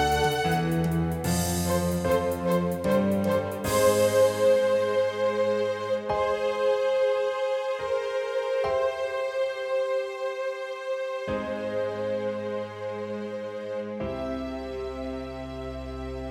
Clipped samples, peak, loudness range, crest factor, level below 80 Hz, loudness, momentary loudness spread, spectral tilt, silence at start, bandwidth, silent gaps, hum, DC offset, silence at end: under 0.1%; -10 dBFS; 9 LU; 16 dB; -48 dBFS; -27 LUFS; 12 LU; -5 dB/octave; 0 s; 17.5 kHz; none; none; under 0.1%; 0 s